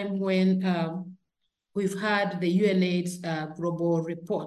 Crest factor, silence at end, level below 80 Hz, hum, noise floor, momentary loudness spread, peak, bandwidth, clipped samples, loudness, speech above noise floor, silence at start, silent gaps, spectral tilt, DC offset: 16 dB; 0 s; -74 dBFS; none; -80 dBFS; 9 LU; -12 dBFS; 12.5 kHz; under 0.1%; -27 LUFS; 54 dB; 0 s; none; -6.5 dB/octave; under 0.1%